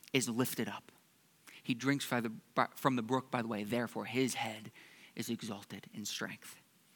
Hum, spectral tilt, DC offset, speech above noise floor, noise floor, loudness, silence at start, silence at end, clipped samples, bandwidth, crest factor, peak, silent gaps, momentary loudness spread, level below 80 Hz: none; -4 dB/octave; under 0.1%; 31 dB; -68 dBFS; -37 LUFS; 0.15 s; 0.35 s; under 0.1%; 19 kHz; 24 dB; -14 dBFS; none; 16 LU; -88 dBFS